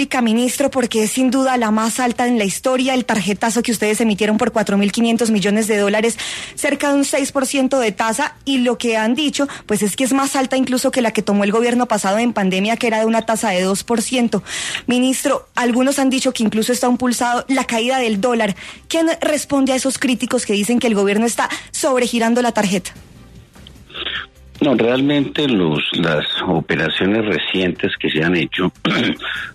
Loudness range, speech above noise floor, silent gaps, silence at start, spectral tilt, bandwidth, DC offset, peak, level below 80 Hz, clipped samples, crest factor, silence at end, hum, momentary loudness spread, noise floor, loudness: 2 LU; 24 dB; none; 0 s; -4 dB/octave; 13.5 kHz; under 0.1%; -2 dBFS; -50 dBFS; under 0.1%; 14 dB; 0 s; none; 4 LU; -41 dBFS; -17 LUFS